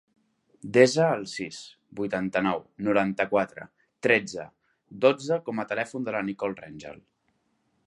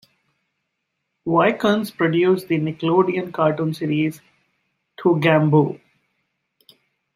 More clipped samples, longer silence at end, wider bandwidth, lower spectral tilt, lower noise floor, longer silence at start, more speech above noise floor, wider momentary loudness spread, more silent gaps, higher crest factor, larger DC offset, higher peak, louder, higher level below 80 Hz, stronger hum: neither; second, 0.9 s vs 1.4 s; second, 11.5 kHz vs 15 kHz; second, -5 dB/octave vs -7.5 dB/octave; second, -72 dBFS vs -76 dBFS; second, 0.65 s vs 1.25 s; second, 46 dB vs 58 dB; first, 22 LU vs 7 LU; neither; about the same, 24 dB vs 20 dB; neither; about the same, -4 dBFS vs -2 dBFS; second, -26 LUFS vs -19 LUFS; about the same, -66 dBFS vs -64 dBFS; neither